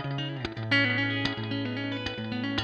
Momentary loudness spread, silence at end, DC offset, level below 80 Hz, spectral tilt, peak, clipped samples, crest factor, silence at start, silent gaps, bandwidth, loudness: 9 LU; 0 s; under 0.1%; -56 dBFS; -6 dB/octave; -10 dBFS; under 0.1%; 20 dB; 0 s; none; 8.8 kHz; -29 LUFS